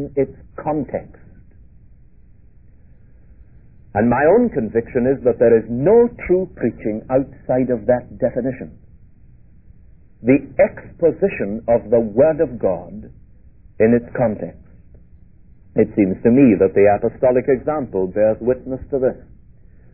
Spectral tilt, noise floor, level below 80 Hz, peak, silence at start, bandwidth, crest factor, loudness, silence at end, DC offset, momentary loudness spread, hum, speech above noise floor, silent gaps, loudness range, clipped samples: -13.5 dB/octave; -48 dBFS; -44 dBFS; -2 dBFS; 0 s; 3 kHz; 18 dB; -18 LUFS; 0.75 s; 0.4%; 12 LU; none; 31 dB; none; 7 LU; under 0.1%